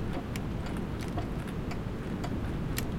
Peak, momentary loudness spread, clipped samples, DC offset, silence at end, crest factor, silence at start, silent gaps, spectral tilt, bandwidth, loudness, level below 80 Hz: -14 dBFS; 2 LU; under 0.1%; under 0.1%; 0 s; 20 dB; 0 s; none; -6 dB/octave; 16.5 kHz; -36 LUFS; -40 dBFS